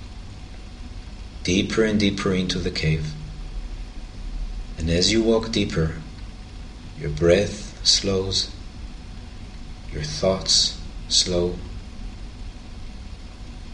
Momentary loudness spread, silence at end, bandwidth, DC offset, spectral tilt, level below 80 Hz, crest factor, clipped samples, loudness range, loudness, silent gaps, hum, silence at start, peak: 22 LU; 0 s; 11 kHz; under 0.1%; -4 dB/octave; -34 dBFS; 20 dB; under 0.1%; 2 LU; -21 LUFS; none; none; 0 s; -4 dBFS